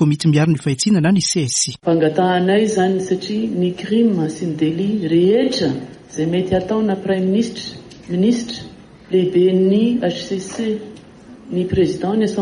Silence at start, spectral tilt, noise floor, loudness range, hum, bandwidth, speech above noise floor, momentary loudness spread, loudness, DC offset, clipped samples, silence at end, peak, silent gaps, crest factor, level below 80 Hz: 0 s; -5.5 dB/octave; -40 dBFS; 3 LU; none; 11.5 kHz; 23 dB; 10 LU; -17 LUFS; under 0.1%; under 0.1%; 0 s; -4 dBFS; none; 14 dB; -48 dBFS